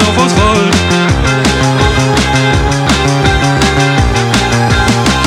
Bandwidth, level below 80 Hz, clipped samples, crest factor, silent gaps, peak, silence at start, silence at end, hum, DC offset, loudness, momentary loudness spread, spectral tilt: 15 kHz; -20 dBFS; under 0.1%; 10 dB; none; 0 dBFS; 0 s; 0 s; none; under 0.1%; -10 LUFS; 2 LU; -4.5 dB/octave